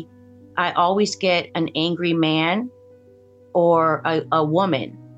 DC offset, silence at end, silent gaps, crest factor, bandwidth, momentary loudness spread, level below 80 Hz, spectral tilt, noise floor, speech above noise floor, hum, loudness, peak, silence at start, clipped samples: under 0.1%; 0.05 s; none; 16 dB; 8.6 kHz; 7 LU; -68 dBFS; -5.5 dB/octave; -50 dBFS; 30 dB; none; -20 LUFS; -6 dBFS; 0 s; under 0.1%